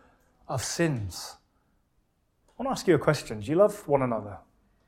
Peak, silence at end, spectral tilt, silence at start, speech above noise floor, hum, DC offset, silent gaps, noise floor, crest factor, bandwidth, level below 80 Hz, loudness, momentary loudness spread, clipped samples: -8 dBFS; 0.5 s; -5.5 dB/octave; 0.5 s; 44 dB; none; under 0.1%; none; -71 dBFS; 22 dB; 16.5 kHz; -58 dBFS; -27 LUFS; 15 LU; under 0.1%